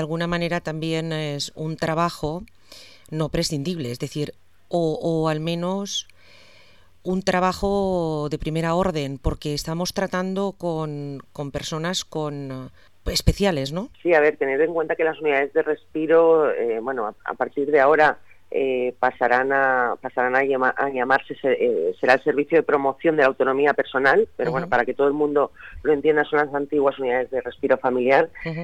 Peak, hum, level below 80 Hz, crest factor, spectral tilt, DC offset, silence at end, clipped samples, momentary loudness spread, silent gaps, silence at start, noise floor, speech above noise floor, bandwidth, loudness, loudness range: -2 dBFS; none; -42 dBFS; 20 dB; -5.5 dB/octave; 0.3%; 0 s; under 0.1%; 10 LU; none; 0 s; -54 dBFS; 33 dB; 14.5 kHz; -22 LUFS; 7 LU